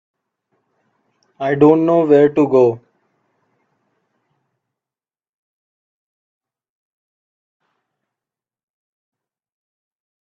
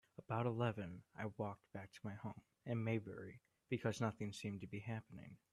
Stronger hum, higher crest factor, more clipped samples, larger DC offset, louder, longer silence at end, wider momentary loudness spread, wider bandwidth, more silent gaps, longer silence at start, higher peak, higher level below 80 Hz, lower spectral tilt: neither; about the same, 20 dB vs 18 dB; neither; neither; first, -13 LUFS vs -46 LUFS; first, 7.45 s vs 0.15 s; about the same, 11 LU vs 13 LU; second, 7.2 kHz vs 12 kHz; neither; first, 1.4 s vs 0.2 s; first, 0 dBFS vs -26 dBFS; first, -66 dBFS vs -78 dBFS; first, -9 dB/octave vs -7 dB/octave